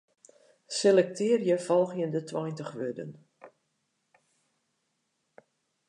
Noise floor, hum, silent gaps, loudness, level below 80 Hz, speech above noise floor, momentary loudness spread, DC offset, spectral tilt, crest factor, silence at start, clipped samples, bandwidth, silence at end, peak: -78 dBFS; none; none; -28 LUFS; -84 dBFS; 51 dB; 13 LU; under 0.1%; -5 dB/octave; 20 dB; 0.7 s; under 0.1%; 11 kHz; 2.4 s; -10 dBFS